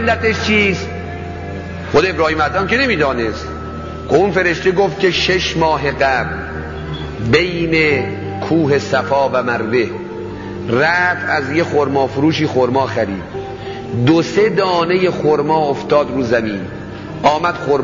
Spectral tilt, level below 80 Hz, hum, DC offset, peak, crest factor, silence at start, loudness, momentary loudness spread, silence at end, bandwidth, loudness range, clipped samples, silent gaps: -5.5 dB/octave; -36 dBFS; none; under 0.1%; 0 dBFS; 16 dB; 0 s; -15 LUFS; 13 LU; 0 s; 7.6 kHz; 1 LU; under 0.1%; none